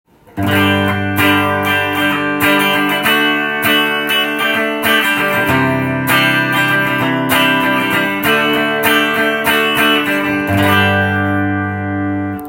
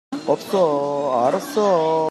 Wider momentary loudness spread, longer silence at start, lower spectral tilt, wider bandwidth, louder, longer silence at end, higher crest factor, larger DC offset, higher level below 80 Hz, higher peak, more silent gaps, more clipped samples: about the same, 4 LU vs 4 LU; first, 0.35 s vs 0.1 s; about the same, -4.5 dB/octave vs -5.5 dB/octave; first, 17 kHz vs 14 kHz; first, -13 LUFS vs -20 LUFS; about the same, 0 s vs 0 s; about the same, 14 dB vs 14 dB; neither; first, -50 dBFS vs -72 dBFS; first, 0 dBFS vs -6 dBFS; neither; neither